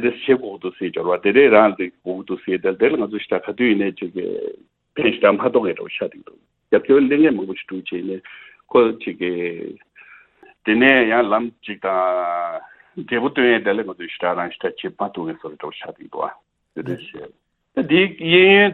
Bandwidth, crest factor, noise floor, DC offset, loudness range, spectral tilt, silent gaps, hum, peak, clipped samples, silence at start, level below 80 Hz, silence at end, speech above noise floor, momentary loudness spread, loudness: 4.2 kHz; 20 dB; -50 dBFS; under 0.1%; 6 LU; -8.5 dB/octave; none; none; 0 dBFS; under 0.1%; 0 s; -62 dBFS; 0 s; 32 dB; 19 LU; -19 LUFS